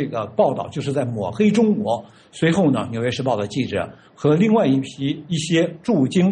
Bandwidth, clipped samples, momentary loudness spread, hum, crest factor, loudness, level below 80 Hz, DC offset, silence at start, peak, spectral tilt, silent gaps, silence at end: 10 kHz; under 0.1%; 9 LU; none; 14 dB; -20 LUFS; -58 dBFS; under 0.1%; 0 s; -4 dBFS; -6.5 dB/octave; none; 0 s